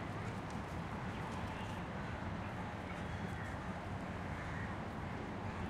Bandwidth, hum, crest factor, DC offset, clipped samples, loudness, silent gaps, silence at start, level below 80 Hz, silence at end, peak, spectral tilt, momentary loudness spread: 14.5 kHz; none; 12 dB; under 0.1%; under 0.1%; -44 LUFS; none; 0 s; -56 dBFS; 0 s; -30 dBFS; -6.5 dB/octave; 1 LU